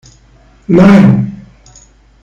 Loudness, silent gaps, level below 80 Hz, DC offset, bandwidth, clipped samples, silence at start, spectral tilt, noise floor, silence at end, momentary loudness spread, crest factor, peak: -7 LUFS; none; -38 dBFS; under 0.1%; 7.4 kHz; 4%; 0.7 s; -8.5 dB/octave; -43 dBFS; 0.9 s; 18 LU; 10 dB; 0 dBFS